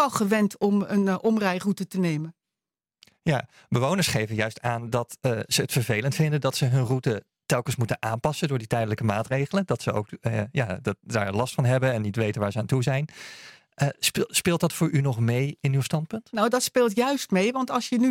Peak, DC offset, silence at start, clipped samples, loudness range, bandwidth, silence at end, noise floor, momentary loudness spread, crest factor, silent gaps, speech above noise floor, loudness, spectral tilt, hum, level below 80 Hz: -6 dBFS; under 0.1%; 0 s; under 0.1%; 3 LU; 16.5 kHz; 0 s; under -90 dBFS; 6 LU; 18 dB; none; over 65 dB; -25 LUFS; -5.5 dB/octave; none; -60 dBFS